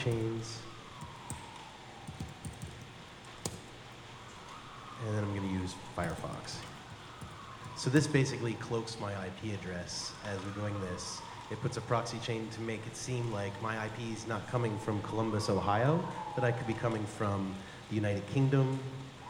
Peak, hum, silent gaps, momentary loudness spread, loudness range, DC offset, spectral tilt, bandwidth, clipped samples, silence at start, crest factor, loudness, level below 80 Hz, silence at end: -12 dBFS; none; none; 17 LU; 12 LU; under 0.1%; -5.5 dB/octave; 17.5 kHz; under 0.1%; 0 s; 24 dB; -36 LUFS; -60 dBFS; 0 s